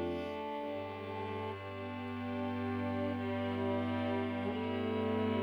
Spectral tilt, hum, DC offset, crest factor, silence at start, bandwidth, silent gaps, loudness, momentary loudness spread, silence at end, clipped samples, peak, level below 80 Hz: -8 dB/octave; none; under 0.1%; 14 dB; 0 s; over 20 kHz; none; -38 LUFS; 7 LU; 0 s; under 0.1%; -22 dBFS; -74 dBFS